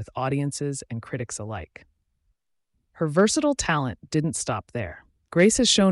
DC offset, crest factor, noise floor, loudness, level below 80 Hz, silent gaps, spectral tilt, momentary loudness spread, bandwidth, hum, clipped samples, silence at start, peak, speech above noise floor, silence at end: under 0.1%; 16 dB; -75 dBFS; -24 LUFS; -50 dBFS; none; -4 dB/octave; 15 LU; 11.5 kHz; none; under 0.1%; 0 s; -8 dBFS; 51 dB; 0 s